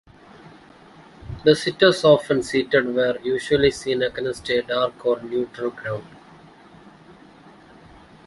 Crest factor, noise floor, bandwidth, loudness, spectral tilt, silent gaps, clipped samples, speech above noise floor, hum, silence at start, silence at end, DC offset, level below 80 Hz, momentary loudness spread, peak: 20 dB; -48 dBFS; 11.5 kHz; -21 LUFS; -5 dB/octave; none; under 0.1%; 27 dB; none; 0.45 s; 1.15 s; under 0.1%; -52 dBFS; 12 LU; -2 dBFS